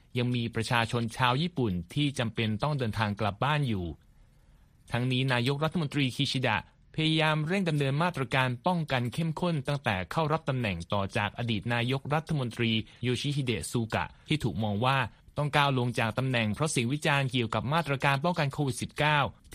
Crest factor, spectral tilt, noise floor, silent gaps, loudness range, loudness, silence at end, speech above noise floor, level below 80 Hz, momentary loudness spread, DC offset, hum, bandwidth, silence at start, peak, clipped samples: 20 dB; -5.5 dB/octave; -59 dBFS; none; 3 LU; -29 LUFS; 0 s; 30 dB; -56 dBFS; 5 LU; under 0.1%; none; 15 kHz; 0.15 s; -8 dBFS; under 0.1%